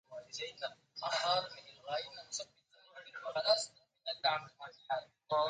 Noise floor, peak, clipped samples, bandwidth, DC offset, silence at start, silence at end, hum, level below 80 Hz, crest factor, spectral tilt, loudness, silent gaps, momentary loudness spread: -66 dBFS; -16 dBFS; under 0.1%; 9.4 kHz; under 0.1%; 0.1 s; 0 s; none; -86 dBFS; 22 dB; -1 dB/octave; -38 LUFS; none; 19 LU